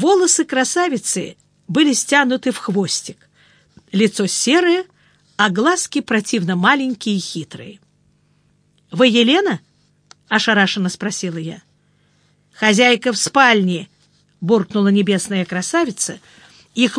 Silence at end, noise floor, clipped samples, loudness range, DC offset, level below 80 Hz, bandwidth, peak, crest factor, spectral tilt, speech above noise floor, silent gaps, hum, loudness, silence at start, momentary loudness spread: 0 s; -59 dBFS; under 0.1%; 4 LU; under 0.1%; -68 dBFS; 10.5 kHz; 0 dBFS; 18 dB; -3.5 dB/octave; 42 dB; none; none; -16 LUFS; 0 s; 15 LU